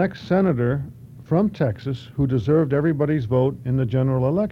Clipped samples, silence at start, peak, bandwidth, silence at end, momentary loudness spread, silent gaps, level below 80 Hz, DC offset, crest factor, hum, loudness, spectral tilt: under 0.1%; 0 s; -6 dBFS; 6.2 kHz; 0 s; 6 LU; none; -46 dBFS; under 0.1%; 14 dB; none; -21 LUFS; -10 dB/octave